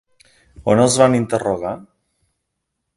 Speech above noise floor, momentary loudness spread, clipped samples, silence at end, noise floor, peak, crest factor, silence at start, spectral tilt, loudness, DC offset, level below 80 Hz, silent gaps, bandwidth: 60 dB; 14 LU; under 0.1%; 1.15 s; -76 dBFS; 0 dBFS; 20 dB; 0.6 s; -5 dB/octave; -17 LUFS; under 0.1%; -50 dBFS; none; 11.5 kHz